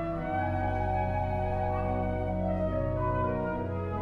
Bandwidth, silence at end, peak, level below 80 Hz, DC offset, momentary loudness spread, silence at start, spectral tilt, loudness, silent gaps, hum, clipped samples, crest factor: 4.8 kHz; 0 s; -18 dBFS; -40 dBFS; under 0.1%; 2 LU; 0 s; -10 dB/octave; -31 LUFS; none; none; under 0.1%; 12 dB